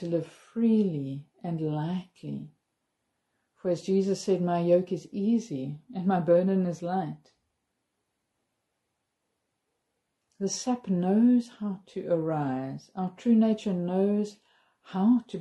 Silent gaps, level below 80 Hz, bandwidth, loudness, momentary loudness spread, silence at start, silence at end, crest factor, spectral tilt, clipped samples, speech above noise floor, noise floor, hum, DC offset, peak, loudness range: none; -74 dBFS; 11 kHz; -28 LUFS; 14 LU; 0 s; 0 s; 18 dB; -7 dB/octave; under 0.1%; 54 dB; -81 dBFS; none; under 0.1%; -12 dBFS; 8 LU